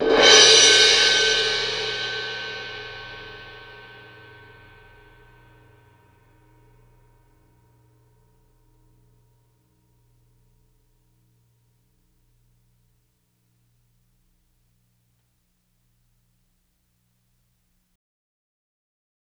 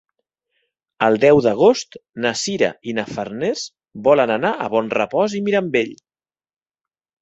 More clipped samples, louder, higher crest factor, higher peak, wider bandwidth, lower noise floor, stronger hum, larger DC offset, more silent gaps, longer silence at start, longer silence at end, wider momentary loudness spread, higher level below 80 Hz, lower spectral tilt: neither; first, -15 LUFS vs -18 LUFS; first, 26 dB vs 20 dB; about the same, 0 dBFS vs 0 dBFS; first, 13.5 kHz vs 8.2 kHz; second, -69 dBFS vs -90 dBFS; first, 60 Hz at -75 dBFS vs none; neither; neither; second, 0 s vs 1 s; first, 15.75 s vs 1.3 s; first, 30 LU vs 12 LU; about the same, -56 dBFS vs -60 dBFS; second, 0.5 dB/octave vs -4.5 dB/octave